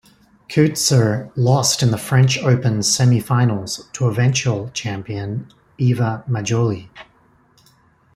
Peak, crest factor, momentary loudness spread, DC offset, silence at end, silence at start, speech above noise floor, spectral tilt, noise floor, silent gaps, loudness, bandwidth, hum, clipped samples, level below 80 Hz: -2 dBFS; 16 dB; 11 LU; under 0.1%; 1.15 s; 0.5 s; 38 dB; -5 dB/octave; -55 dBFS; none; -18 LUFS; 14 kHz; none; under 0.1%; -54 dBFS